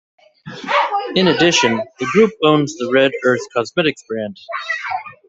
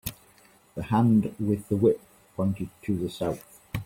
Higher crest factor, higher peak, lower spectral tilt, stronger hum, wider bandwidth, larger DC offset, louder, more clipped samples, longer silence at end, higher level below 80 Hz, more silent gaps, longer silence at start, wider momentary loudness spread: about the same, 16 dB vs 18 dB; first, 0 dBFS vs -10 dBFS; second, -4 dB/octave vs -8 dB/octave; neither; second, 8 kHz vs 16.5 kHz; neither; first, -16 LUFS vs -27 LUFS; neither; first, 0.15 s vs 0 s; about the same, -58 dBFS vs -54 dBFS; neither; first, 0.45 s vs 0.05 s; second, 13 LU vs 16 LU